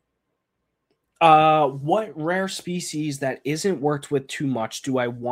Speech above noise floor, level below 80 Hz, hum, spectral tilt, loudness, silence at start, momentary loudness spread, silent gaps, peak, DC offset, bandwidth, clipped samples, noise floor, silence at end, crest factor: 56 dB; -66 dBFS; none; -5 dB/octave; -22 LUFS; 1.2 s; 12 LU; none; -2 dBFS; under 0.1%; 16 kHz; under 0.1%; -77 dBFS; 0 s; 22 dB